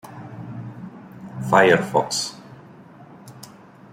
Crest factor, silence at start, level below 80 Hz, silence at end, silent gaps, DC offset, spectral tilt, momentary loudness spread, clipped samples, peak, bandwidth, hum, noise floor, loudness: 22 dB; 0.05 s; -62 dBFS; 0.45 s; none; under 0.1%; -4 dB/octave; 27 LU; under 0.1%; -2 dBFS; 16 kHz; none; -45 dBFS; -19 LUFS